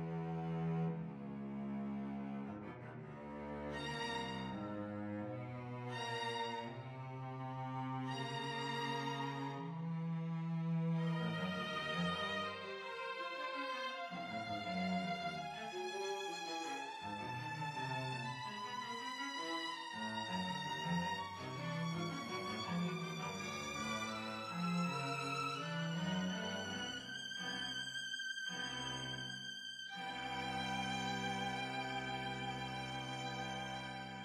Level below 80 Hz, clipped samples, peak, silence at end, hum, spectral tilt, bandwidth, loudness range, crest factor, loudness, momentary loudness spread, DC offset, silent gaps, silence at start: -70 dBFS; under 0.1%; -28 dBFS; 0 s; none; -4.5 dB/octave; 14.5 kHz; 4 LU; 16 dB; -42 LUFS; 6 LU; under 0.1%; none; 0 s